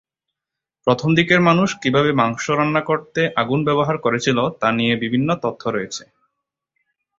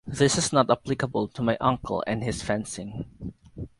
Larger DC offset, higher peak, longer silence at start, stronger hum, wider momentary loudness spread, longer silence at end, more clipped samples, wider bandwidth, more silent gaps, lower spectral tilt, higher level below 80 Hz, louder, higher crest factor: neither; about the same, -2 dBFS vs -4 dBFS; first, 0.85 s vs 0.05 s; neither; second, 9 LU vs 16 LU; first, 1.15 s vs 0.15 s; neither; second, 7.8 kHz vs 11.5 kHz; neither; about the same, -5.5 dB/octave vs -4.5 dB/octave; second, -56 dBFS vs -50 dBFS; first, -18 LUFS vs -26 LUFS; about the same, 18 dB vs 22 dB